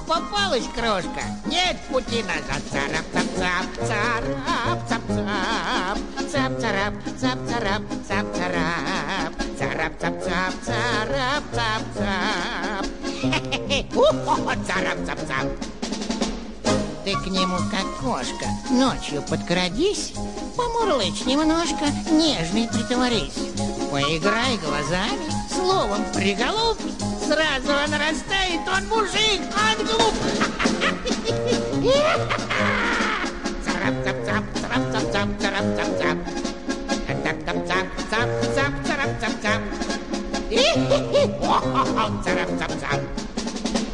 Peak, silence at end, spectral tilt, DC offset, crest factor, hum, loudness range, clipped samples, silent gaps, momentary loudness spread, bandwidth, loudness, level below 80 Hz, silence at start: -4 dBFS; 0 s; -4 dB/octave; 1%; 18 dB; none; 4 LU; under 0.1%; none; 7 LU; 11.5 kHz; -23 LUFS; -40 dBFS; 0 s